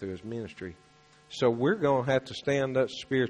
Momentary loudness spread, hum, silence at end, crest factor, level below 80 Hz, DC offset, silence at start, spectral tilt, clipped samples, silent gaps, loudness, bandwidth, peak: 16 LU; none; 0 s; 16 dB; -62 dBFS; under 0.1%; 0 s; -6 dB/octave; under 0.1%; none; -28 LUFS; 9.8 kHz; -12 dBFS